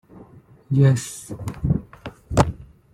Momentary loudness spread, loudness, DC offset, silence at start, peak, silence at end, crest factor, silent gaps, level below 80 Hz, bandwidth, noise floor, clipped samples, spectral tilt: 21 LU; -22 LUFS; under 0.1%; 0.15 s; -2 dBFS; 0.3 s; 22 dB; none; -38 dBFS; 12.5 kHz; -48 dBFS; under 0.1%; -7 dB/octave